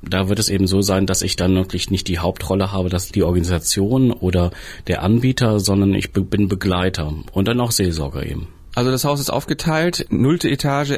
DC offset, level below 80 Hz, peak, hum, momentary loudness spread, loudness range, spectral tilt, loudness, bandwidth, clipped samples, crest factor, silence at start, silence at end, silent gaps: under 0.1%; -32 dBFS; -6 dBFS; none; 6 LU; 2 LU; -5 dB/octave; -19 LUFS; 16 kHz; under 0.1%; 12 dB; 0 s; 0 s; none